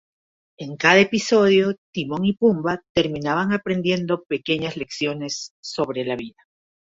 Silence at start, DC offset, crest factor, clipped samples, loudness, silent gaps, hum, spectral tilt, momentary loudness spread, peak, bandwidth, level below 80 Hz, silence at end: 0.6 s; under 0.1%; 20 dB; under 0.1%; -21 LUFS; 1.78-1.93 s, 2.89-2.95 s, 5.51-5.63 s; none; -5 dB/octave; 13 LU; -2 dBFS; 8 kHz; -56 dBFS; 0.65 s